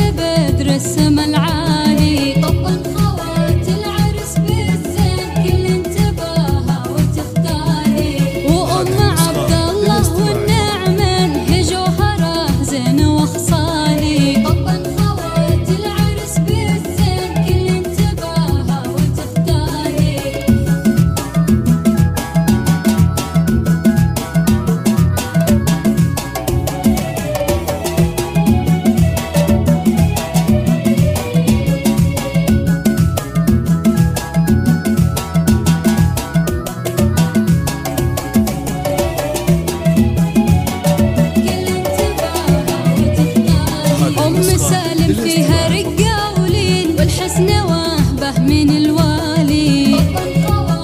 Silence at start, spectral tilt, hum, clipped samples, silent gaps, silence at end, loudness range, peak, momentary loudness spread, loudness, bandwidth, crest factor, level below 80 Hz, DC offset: 0 s; -6 dB/octave; none; under 0.1%; none; 0 s; 2 LU; 0 dBFS; 4 LU; -15 LUFS; 16 kHz; 12 dB; -28 dBFS; under 0.1%